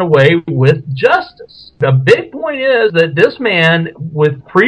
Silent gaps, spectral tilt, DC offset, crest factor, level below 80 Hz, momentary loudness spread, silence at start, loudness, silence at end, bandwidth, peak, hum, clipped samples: none; -7 dB/octave; under 0.1%; 12 dB; -52 dBFS; 7 LU; 0 s; -12 LUFS; 0 s; 9.2 kHz; 0 dBFS; none; 0.8%